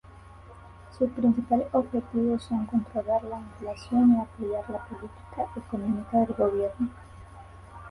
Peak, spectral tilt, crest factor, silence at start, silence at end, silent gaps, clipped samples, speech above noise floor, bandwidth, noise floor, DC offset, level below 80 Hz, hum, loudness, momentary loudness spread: -12 dBFS; -8.5 dB/octave; 16 dB; 0.05 s; 0 s; none; under 0.1%; 21 dB; 10.5 kHz; -48 dBFS; under 0.1%; -52 dBFS; none; -28 LUFS; 20 LU